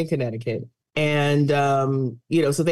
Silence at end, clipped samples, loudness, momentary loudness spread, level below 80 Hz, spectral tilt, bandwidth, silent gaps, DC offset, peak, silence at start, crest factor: 0 s; under 0.1%; -22 LUFS; 10 LU; -62 dBFS; -6.5 dB/octave; 12.5 kHz; none; under 0.1%; -10 dBFS; 0 s; 12 dB